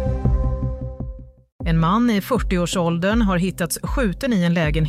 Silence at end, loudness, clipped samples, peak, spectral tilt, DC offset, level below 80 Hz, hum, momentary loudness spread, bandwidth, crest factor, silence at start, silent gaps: 0 s; -21 LUFS; under 0.1%; -6 dBFS; -6 dB/octave; under 0.1%; -28 dBFS; none; 11 LU; 15.5 kHz; 14 dB; 0 s; 1.52-1.59 s